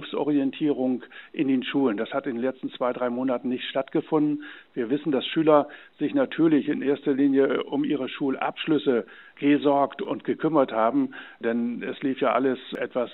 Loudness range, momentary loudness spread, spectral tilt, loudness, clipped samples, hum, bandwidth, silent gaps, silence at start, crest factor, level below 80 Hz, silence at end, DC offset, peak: 3 LU; 9 LU; -9.5 dB/octave; -25 LUFS; under 0.1%; none; 4.1 kHz; none; 0 s; 18 dB; -78 dBFS; 0 s; under 0.1%; -6 dBFS